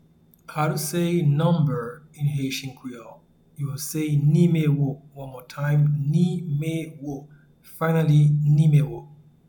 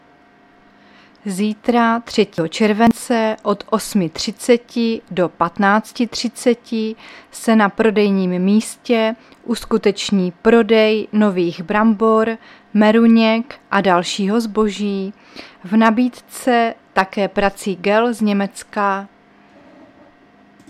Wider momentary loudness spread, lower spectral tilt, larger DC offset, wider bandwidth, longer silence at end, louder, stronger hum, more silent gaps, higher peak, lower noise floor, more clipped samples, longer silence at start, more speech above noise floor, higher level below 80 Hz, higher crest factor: first, 19 LU vs 9 LU; first, -7 dB/octave vs -5.5 dB/octave; neither; first, 19 kHz vs 14 kHz; second, 0.35 s vs 1.65 s; second, -22 LUFS vs -17 LUFS; neither; neither; second, -8 dBFS vs 0 dBFS; about the same, -49 dBFS vs -50 dBFS; neither; second, 0.5 s vs 1.25 s; second, 27 dB vs 33 dB; second, -56 dBFS vs -50 dBFS; about the same, 16 dB vs 18 dB